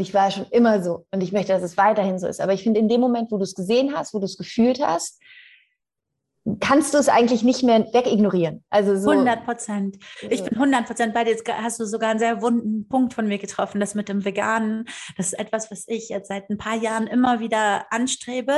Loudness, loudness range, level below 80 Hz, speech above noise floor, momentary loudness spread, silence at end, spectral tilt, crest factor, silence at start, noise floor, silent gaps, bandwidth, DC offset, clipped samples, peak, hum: -21 LUFS; 6 LU; -60 dBFS; 61 dB; 10 LU; 0 s; -5 dB/octave; 16 dB; 0 s; -82 dBFS; none; 12.5 kHz; under 0.1%; under 0.1%; -4 dBFS; none